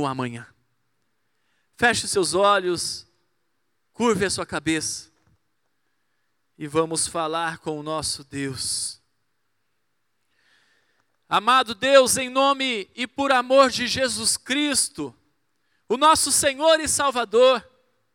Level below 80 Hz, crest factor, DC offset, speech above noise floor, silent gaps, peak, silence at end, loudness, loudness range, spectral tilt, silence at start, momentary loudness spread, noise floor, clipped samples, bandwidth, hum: -58 dBFS; 20 dB; under 0.1%; 55 dB; none; -2 dBFS; 0.55 s; -21 LUFS; 9 LU; -2 dB/octave; 0 s; 12 LU; -76 dBFS; under 0.1%; 18 kHz; none